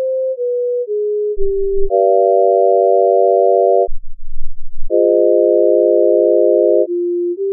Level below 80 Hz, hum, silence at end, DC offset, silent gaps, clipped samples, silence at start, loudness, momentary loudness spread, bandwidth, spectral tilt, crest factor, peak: -28 dBFS; none; 0 s; under 0.1%; none; under 0.1%; 0 s; -13 LUFS; 7 LU; 0.8 kHz; 3 dB/octave; 10 dB; -2 dBFS